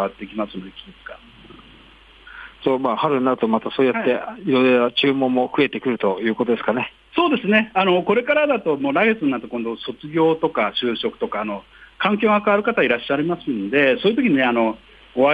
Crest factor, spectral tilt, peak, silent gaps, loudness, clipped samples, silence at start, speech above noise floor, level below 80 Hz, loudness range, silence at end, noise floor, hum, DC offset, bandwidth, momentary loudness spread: 16 dB; -7.5 dB/octave; -4 dBFS; none; -20 LUFS; under 0.1%; 0 s; 28 dB; -56 dBFS; 4 LU; 0 s; -48 dBFS; none; under 0.1%; 5 kHz; 12 LU